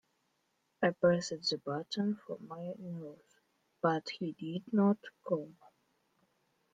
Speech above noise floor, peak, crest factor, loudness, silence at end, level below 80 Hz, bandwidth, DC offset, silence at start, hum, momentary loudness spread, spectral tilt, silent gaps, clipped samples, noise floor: 45 dB; -16 dBFS; 20 dB; -35 LUFS; 1.25 s; -80 dBFS; 9 kHz; under 0.1%; 0.8 s; none; 14 LU; -6 dB/octave; none; under 0.1%; -79 dBFS